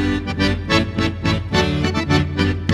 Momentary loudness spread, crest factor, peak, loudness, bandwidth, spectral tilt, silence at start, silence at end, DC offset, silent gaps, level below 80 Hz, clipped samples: 4 LU; 16 dB; -2 dBFS; -19 LUFS; 12 kHz; -6 dB/octave; 0 s; 0 s; under 0.1%; none; -32 dBFS; under 0.1%